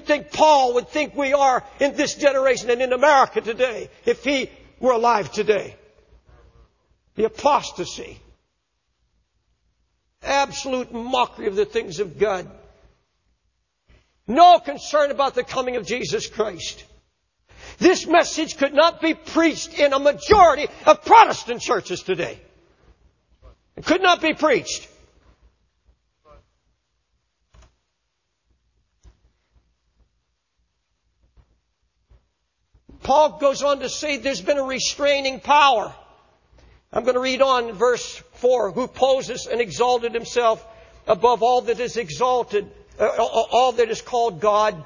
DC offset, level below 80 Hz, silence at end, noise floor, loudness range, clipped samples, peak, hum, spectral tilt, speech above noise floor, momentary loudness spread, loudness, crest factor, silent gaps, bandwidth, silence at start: under 0.1%; -52 dBFS; 0 s; -75 dBFS; 9 LU; under 0.1%; 0 dBFS; none; -3 dB/octave; 56 dB; 11 LU; -20 LUFS; 22 dB; none; 7.4 kHz; 0.05 s